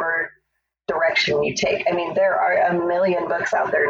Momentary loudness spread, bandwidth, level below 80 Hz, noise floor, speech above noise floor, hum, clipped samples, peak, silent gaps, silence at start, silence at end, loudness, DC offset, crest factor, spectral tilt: 6 LU; 7.8 kHz; -58 dBFS; -74 dBFS; 54 dB; none; under 0.1%; -8 dBFS; none; 0 s; 0 s; -20 LUFS; under 0.1%; 14 dB; -4 dB/octave